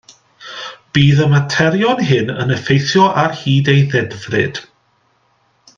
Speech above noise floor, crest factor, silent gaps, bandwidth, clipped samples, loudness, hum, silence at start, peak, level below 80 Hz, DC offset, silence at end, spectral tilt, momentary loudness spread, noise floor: 45 dB; 16 dB; none; 7.2 kHz; under 0.1%; -14 LUFS; none; 0.4 s; 0 dBFS; -50 dBFS; under 0.1%; 1.15 s; -6 dB/octave; 15 LU; -59 dBFS